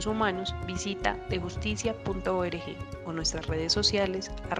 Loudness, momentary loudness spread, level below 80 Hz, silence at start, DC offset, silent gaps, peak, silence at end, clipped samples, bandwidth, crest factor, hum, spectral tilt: -30 LUFS; 11 LU; -42 dBFS; 0 s; under 0.1%; none; -8 dBFS; 0 s; under 0.1%; 11 kHz; 22 dB; none; -4 dB/octave